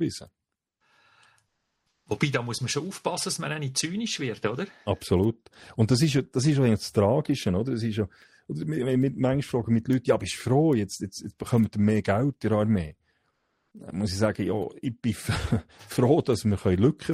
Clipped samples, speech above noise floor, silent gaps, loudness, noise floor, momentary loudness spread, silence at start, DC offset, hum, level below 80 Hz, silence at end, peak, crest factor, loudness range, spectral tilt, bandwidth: under 0.1%; 50 dB; none; -26 LUFS; -76 dBFS; 10 LU; 0 s; under 0.1%; none; -52 dBFS; 0 s; -8 dBFS; 18 dB; 5 LU; -6 dB/octave; 15.5 kHz